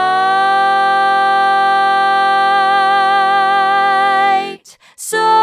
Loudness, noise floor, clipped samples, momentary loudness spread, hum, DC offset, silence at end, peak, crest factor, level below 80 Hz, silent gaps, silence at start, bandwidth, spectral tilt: -12 LUFS; -37 dBFS; under 0.1%; 3 LU; none; under 0.1%; 0 s; -2 dBFS; 10 dB; -84 dBFS; none; 0 s; 15 kHz; -1.5 dB/octave